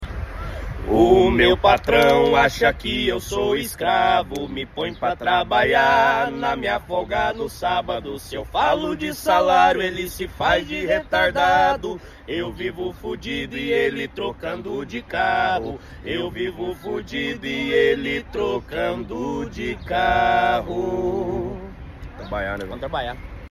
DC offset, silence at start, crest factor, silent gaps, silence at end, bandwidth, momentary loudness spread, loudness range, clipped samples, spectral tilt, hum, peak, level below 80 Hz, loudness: under 0.1%; 0 s; 18 dB; none; 0 s; 15 kHz; 14 LU; 7 LU; under 0.1%; -5 dB/octave; none; -2 dBFS; -38 dBFS; -21 LUFS